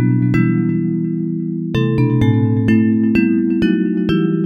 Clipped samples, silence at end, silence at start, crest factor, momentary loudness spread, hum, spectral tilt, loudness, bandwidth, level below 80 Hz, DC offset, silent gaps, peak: under 0.1%; 0 s; 0 s; 14 dB; 6 LU; none; -9.5 dB/octave; -16 LUFS; 6.8 kHz; -40 dBFS; under 0.1%; none; -2 dBFS